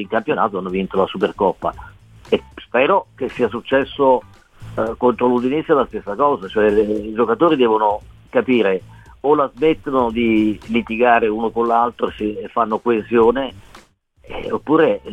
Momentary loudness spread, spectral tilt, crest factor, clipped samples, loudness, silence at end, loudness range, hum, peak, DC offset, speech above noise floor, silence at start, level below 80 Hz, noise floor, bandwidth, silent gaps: 9 LU; -7.5 dB/octave; 16 dB; under 0.1%; -18 LUFS; 0 s; 3 LU; none; -2 dBFS; 0.1%; 32 dB; 0 s; -46 dBFS; -50 dBFS; 8.8 kHz; none